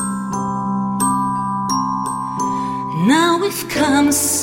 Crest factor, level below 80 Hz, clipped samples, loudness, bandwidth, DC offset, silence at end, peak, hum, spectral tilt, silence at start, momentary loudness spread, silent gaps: 16 dB; -48 dBFS; under 0.1%; -18 LUFS; 17 kHz; under 0.1%; 0 s; -2 dBFS; none; -4 dB/octave; 0 s; 8 LU; none